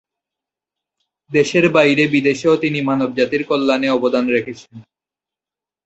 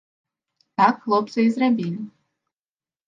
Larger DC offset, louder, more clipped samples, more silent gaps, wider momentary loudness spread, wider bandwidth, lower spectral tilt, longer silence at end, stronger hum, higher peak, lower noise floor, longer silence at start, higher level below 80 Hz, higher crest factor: neither; first, -16 LUFS vs -21 LUFS; neither; neither; second, 7 LU vs 14 LU; about the same, 8.2 kHz vs 7.6 kHz; second, -5.5 dB/octave vs -7 dB/octave; about the same, 1.05 s vs 1 s; neither; about the same, -2 dBFS vs -4 dBFS; about the same, -89 dBFS vs under -90 dBFS; first, 1.3 s vs 0.8 s; first, -60 dBFS vs -76 dBFS; about the same, 16 dB vs 20 dB